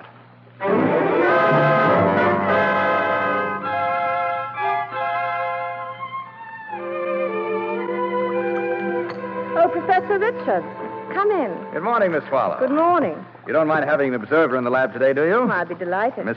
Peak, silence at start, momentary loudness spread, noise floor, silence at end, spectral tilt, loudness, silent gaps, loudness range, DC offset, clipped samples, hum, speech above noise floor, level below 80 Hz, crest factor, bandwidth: -6 dBFS; 0 s; 11 LU; -46 dBFS; 0 s; -8.5 dB/octave; -20 LUFS; none; 7 LU; under 0.1%; under 0.1%; none; 26 dB; -72 dBFS; 14 dB; 6.2 kHz